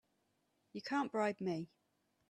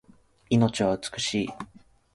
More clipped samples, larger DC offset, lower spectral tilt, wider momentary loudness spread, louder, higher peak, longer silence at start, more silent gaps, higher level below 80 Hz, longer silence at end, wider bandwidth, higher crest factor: neither; neither; about the same, -6 dB/octave vs -5 dB/octave; about the same, 15 LU vs 16 LU; second, -40 LUFS vs -26 LUFS; second, -24 dBFS vs -8 dBFS; first, 0.75 s vs 0.5 s; neither; second, -86 dBFS vs -56 dBFS; first, 0.65 s vs 0.5 s; about the same, 12 kHz vs 11.5 kHz; about the same, 20 dB vs 20 dB